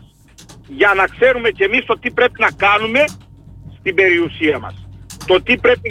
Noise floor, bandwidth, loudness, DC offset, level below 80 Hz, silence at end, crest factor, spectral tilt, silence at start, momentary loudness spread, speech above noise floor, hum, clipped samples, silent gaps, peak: -44 dBFS; 14.5 kHz; -14 LUFS; under 0.1%; -44 dBFS; 0 s; 14 dB; -4.5 dB/octave; 0.5 s; 9 LU; 29 dB; none; under 0.1%; none; -2 dBFS